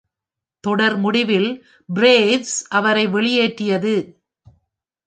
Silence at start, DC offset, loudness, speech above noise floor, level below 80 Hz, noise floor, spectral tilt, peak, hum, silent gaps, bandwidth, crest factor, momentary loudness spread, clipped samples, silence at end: 0.65 s; under 0.1%; -17 LUFS; 69 dB; -66 dBFS; -86 dBFS; -4 dB/octave; -2 dBFS; none; none; 9.6 kHz; 18 dB; 11 LU; under 0.1%; 0.95 s